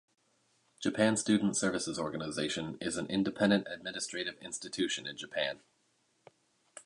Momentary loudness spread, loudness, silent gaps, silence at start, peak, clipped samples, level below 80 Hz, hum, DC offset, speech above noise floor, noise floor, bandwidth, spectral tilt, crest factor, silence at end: 9 LU; -33 LUFS; none; 0.8 s; -14 dBFS; under 0.1%; -68 dBFS; none; under 0.1%; 41 dB; -74 dBFS; 11.5 kHz; -4 dB/octave; 20 dB; 0.05 s